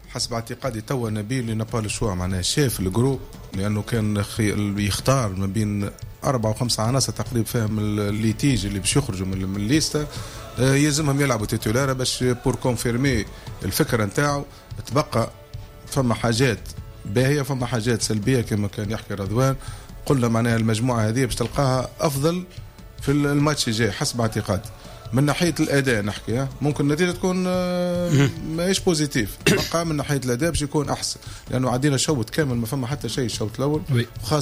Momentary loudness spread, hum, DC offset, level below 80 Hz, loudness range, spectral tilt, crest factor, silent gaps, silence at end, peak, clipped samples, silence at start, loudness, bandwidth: 8 LU; none; under 0.1%; -40 dBFS; 2 LU; -5 dB/octave; 16 dB; none; 0 s; -8 dBFS; under 0.1%; 0 s; -23 LUFS; 16 kHz